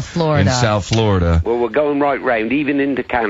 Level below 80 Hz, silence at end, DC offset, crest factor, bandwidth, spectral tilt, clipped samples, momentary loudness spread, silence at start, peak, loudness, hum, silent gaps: -28 dBFS; 0 s; under 0.1%; 14 dB; 8 kHz; -6 dB/octave; under 0.1%; 3 LU; 0 s; -2 dBFS; -16 LUFS; none; none